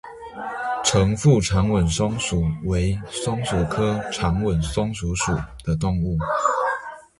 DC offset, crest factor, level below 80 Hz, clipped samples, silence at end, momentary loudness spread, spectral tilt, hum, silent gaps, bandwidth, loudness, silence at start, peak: under 0.1%; 18 dB; -34 dBFS; under 0.1%; 0.2 s; 9 LU; -5.5 dB/octave; none; none; 11.5 kHz; -22 LUFS; 0.05 s; -4 dBFS